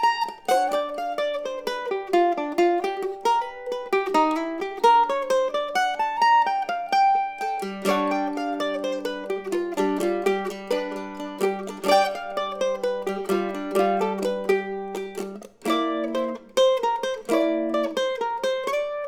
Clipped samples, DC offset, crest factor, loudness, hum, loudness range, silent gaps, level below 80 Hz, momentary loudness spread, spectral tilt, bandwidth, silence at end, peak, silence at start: under 0.1%; under 0.1%; 18 dB; -24 LUFS; none; 4 LU; none; -64 dBFS; 9 LU; -4 dB/octave; 19 kHz; 0 s; -6 dBFS; 0 s